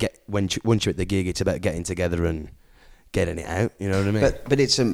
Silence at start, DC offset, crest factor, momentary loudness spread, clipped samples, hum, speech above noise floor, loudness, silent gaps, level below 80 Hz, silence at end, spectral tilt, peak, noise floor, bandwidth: 0 s; under 0.1%; 20 dB; 6 LU; under 0.1%; none; 28 dB; -24 LUFS; none; -40 dBFS; 0 s; -5 dB/octave; -4 dBFS; -51 dBFS; 15.5 kHz